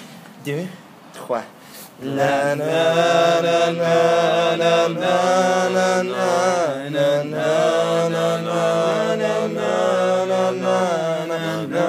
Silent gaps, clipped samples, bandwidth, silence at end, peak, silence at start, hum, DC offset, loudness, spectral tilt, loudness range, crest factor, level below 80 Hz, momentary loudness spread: none; under 0.1%; 15.5 kHz; 0 s; -4 dBFS; 0 s; none; under 0.1%; -19 LUFS; -4.5 dB/octave; 3 LU; 16 dB; -74 dBFS; 11 LU